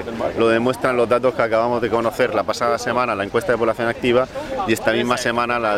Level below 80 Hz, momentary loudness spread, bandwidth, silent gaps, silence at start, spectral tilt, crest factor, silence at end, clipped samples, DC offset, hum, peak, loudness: -48 dBFS; 3 LU; 16 kHz; none; 0 s; -5 dB/octave; 18 dB; 0 s; under 0.1%; under 0.1%; none; -2 dBFS; -19 LUFS